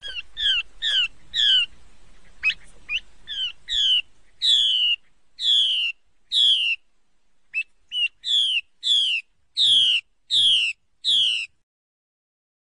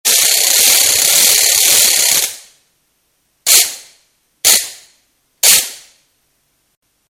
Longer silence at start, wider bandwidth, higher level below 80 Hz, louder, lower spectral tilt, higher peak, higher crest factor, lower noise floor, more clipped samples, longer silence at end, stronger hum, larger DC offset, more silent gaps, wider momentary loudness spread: about the same, 0 s vs 0.05 s; second, 10.5 kHz vs over 20 kHz; about the same, -58 dBFS vs -56 dBFS; second, -20 LUFS vs -9 LUFS; about the same, 3 dB/octave vs 3 dB/octave; second, -8 dBFS vs 0 dBFS; about the same, 16 dB vs 14 dB; first, -68 dBFS vs -62 dBFS; second, under 0.1% vs 0.4%; second, 1.15 s vs 1.35 s; neither; neither; neither; about the same, 12 LU vs 12 LU